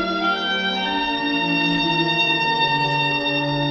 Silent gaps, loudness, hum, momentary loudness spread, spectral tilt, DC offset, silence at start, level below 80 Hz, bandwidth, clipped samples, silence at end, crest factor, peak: none; -19 LUFS; none; 3 LU; -5 dB/octave; under 0.1%; 0 s; -50 dBFS; 7.8 kHz; under 0.1%; 0 s; 12 dB; -8 dBFS